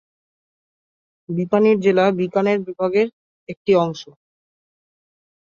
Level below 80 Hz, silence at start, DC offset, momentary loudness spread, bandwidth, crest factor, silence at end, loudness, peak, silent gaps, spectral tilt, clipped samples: -66 dBFS; 1.3 s; under 0.1%; 13 LU; 7.2 kHz; 18 dB; 1.4 s; -19 LUFS; -4 dBFS; 3.13-3.47 s, 3.57-3.65 s; -7.5 dB/octave; under 0.1%